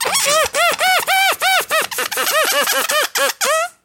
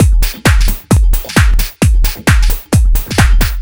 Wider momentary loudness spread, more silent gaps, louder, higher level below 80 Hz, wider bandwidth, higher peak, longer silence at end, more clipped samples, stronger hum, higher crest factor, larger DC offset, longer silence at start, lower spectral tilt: about the same, 4 LU vs 2 LU; neither; second, -15 LUFS vs -12 LUFS; second, -60 dBFS vs -10 dBFS; second, 17 kHz vs over 20 kHz; about the same, -2 dBFS vs 0 dBFS; first, 0.15 s vs 0 s; second, under 0.1% vs 0.3%; neither; first, 16 dB vs 10 dB; second, under 0.1% vs 1%; about the same, 0 s vs 0 s; second, 1 dB/octave vs -5 dB/octave